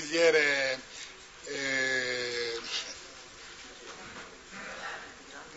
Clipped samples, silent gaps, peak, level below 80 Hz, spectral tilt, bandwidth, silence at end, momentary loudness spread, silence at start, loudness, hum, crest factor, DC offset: under 0.1%; none; -12 dBFS; -66 dBFS; -1.5 dB/octave; 8 kHz; 0 s; 21 LU; 0 s; -30 LUFS; none; 20 dB; under 0.1%